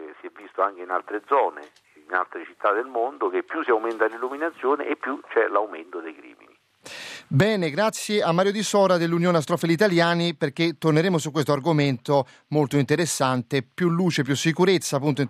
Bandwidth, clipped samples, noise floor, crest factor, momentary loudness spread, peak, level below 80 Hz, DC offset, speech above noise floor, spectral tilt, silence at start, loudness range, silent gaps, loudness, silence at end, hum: 15.5 kHz; under 0.1%; -51 dBFS; 20 dB; 9 LU; -4 dBFS; -70 dBFS; under 0.1%; 28 dB; -5.5 dB/octave; 0 s; 5 LU; none; -23 LUFS; 0 s; none